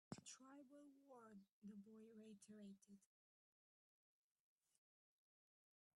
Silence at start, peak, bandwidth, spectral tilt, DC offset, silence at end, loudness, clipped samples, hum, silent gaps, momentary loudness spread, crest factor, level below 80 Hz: 0.1 s; -40 dBFS; 11 kHz; -4.5 dB/octave; under 0.1%; 2.95 s; -64 LUFS; under 0.1%; none; 1.52-1.62 s; 7 LU; 26 dB; under -90 dBFS